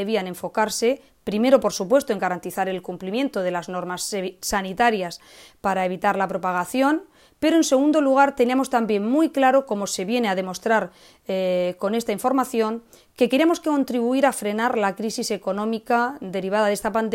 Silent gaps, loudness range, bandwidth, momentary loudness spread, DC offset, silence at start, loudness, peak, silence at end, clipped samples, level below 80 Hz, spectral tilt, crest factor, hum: none; 5 LU; 16 kHz; 9 LU; under 0.1%; 0 s; -22 LUFS; -2 dBFS; 0 s; under 0.1%; -58 dBFS; -4.5 dB/octave; 20 dB; none